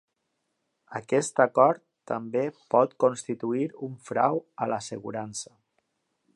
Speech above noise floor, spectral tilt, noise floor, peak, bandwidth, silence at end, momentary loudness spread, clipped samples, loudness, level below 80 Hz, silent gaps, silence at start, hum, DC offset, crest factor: 52 dB; -5 dB/octave; -79 dBFS; -4 dBFS; 11.5 kHz; 0.9 s; 15 LU; under 0.1%; -27 LUFS; -76 dBFS; none; 0.9 s; none; under 0.1%; 22 dB